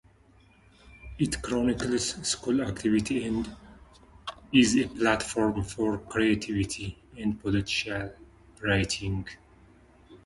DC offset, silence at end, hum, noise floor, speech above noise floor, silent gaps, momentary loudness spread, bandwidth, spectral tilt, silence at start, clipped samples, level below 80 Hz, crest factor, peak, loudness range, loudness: under 0.1%; 0.1 s; none; -59 dBFS; 31 dB; none; 12 LU; 11.5 kHz; -4.5 dB/octave; 0.85 s; under 0.1%; -48 dBFS; 22 dB; -8 dBFS; 4 LU; -28 LUFS